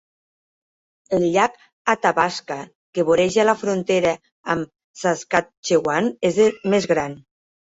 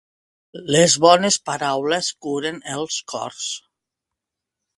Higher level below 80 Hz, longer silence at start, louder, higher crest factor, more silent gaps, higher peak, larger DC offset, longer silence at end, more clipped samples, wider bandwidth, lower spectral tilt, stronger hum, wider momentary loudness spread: about the same, -58 dBFS vs -62 dBFS; first, 1.1 s vs 0.55 s; about the same, -20 LUFS vs -19 LUFS; about the same, 18 dB vs 22 dB; first, 1.73-1.85 s, 2.75-2.93 s, 4.32-4.44 s, 4.84-4.94 s, 5.57-5.63 s vs none; about the same, -2 dBFS vs 0 dBFS; neither; second, 0.55 s vs 1.2 s; neither; second, 8 kHz vs 11.5 kHz; first, -4.5 dB/octave vs -3 dB/octave; neither; second, 11 LU vs 14 LU